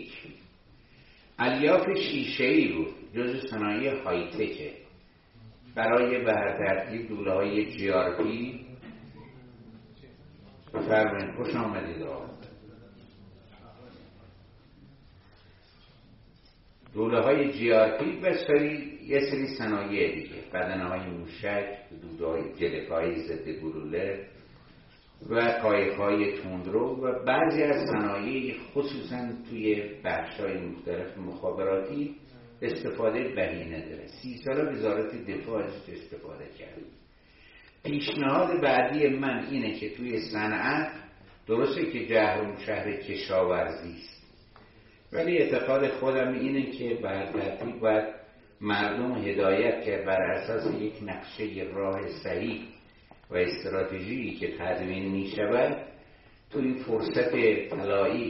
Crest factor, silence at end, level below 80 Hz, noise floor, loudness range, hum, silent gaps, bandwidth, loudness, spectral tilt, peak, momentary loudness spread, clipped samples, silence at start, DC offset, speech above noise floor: 20 dB; 0 s; -60 dBFS; -58 dBFS; 6 LU; none; none; 5.8 kHz; -29 LUFS; -4 dB/octave; -10 dBFS; 15 LU; under 0.1%; 0 s; under 0.1%; 29 dB